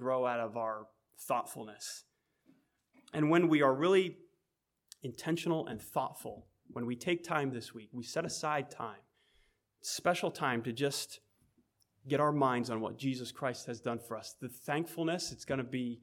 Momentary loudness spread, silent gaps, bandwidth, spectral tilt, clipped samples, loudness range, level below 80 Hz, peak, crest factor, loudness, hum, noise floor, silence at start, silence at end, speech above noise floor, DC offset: 16 LU; none; 18 kHz; -5 dB/octave; under 0.1%; 6 LU; -76 dBFS; -16 dBFS; 20 dB; -35 LUFS; none; -85 dBFS; 0 s; 0 s; 50 dB; under 0.1%